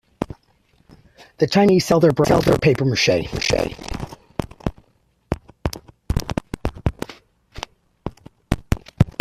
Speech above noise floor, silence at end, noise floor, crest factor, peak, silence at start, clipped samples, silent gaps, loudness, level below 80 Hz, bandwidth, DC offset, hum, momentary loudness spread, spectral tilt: 44 dB; 0.1 s; -61 dBFS; 20 dB; 0 dBFS; 0.2 s; under 0.1%; none; -21 LUFS; -36 dBFS; 14.5 kHz; under 0.1%; none; 20 LU; -5.5 dB/octave